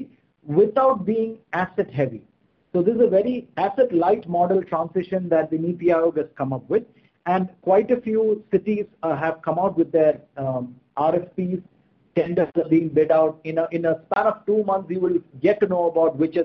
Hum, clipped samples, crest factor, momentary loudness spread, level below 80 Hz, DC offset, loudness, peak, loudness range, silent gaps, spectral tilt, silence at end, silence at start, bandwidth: none; under 0.1%; 16 dB; 8 LU; -62 dBFS; under 0.1%; -22 LUFS; -6 dBFS; 2 LU; none; -10 dB/octave; 0 s; 0 s; 5.8 kHz